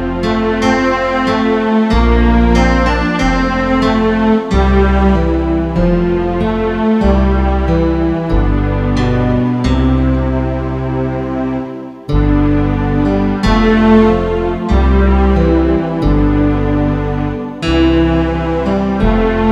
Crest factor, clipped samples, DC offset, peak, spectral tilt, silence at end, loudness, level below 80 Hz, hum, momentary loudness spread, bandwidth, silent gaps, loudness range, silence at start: 12 dB; under 0.1%; under 0.1%; 0 dBFS; -7.5 dB/octave; 0 s; -13 LUFS; -18 dBFS; none; 6 LU; 8.2 kHz; none; 3 LU; 0 s